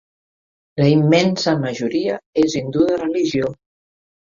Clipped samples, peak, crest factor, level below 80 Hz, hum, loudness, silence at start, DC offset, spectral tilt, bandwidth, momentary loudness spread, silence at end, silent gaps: under 0.1%; -2 dBFS; 18 dB; -56 dBFS; none; -18 LUFS; 0.75 s; under 0.1%; -6 dB/octave; 7.6 kHz; 7 LU; 0.8 s; 2.26-2.33 s